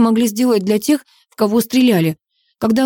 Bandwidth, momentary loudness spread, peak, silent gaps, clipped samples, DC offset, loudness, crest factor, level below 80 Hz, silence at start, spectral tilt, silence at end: 18.5 kHz; 7 LU; -4 dBFS; none; under 0.1%; under 0.1%; -16 LUFS; 12 dB; -58 dBFS; 0 s; -5.5 dB/octave; 0 s